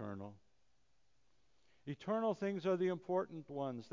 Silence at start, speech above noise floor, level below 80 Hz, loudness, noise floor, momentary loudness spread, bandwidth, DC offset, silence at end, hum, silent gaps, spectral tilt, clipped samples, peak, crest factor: 0 s; 41 dB; -78 dBFS; -40 LUFS; -80 dBFS; 14 LU; 7.6 kHz; under 0.1%; 0.05 s; none; none; -7.5 dB/octave; under 0.1%; -26 dBFS; 16 dB